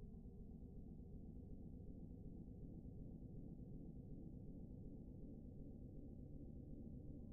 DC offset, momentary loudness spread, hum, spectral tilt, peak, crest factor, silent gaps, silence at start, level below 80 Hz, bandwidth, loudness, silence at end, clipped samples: under 0.1%; 2 LU; none; -11.5 dB/octave; -42 dBFS; 12 dB; none; 0 s; -60 dBFS; 1.1 kHz; -58 LUFS; 0 s; under 0.1%